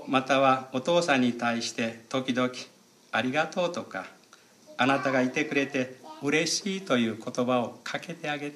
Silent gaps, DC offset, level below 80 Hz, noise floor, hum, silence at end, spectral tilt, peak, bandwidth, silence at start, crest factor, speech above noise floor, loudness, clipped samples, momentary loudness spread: none; under 0.1%; -78 dBFS; -57 dBFS; none; 0 s; -4 dB/octave; -10 dBFS; 13 kHz; 0 s; 18 dB; 29 dB; -27 LUFS; under 0.1%; 12 LU